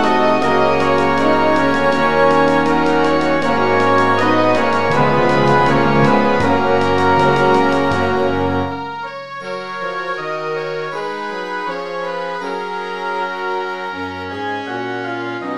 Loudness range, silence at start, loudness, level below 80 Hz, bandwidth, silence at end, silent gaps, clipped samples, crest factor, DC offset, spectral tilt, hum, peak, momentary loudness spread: 9 LU; 0 s; -16 LUFS; -42 dBFS; 12.5 kHz; 0 s; none; under 0.1%; 14 dB; 5%; -6 dB/octave; none; 0 dBFS; 11 LU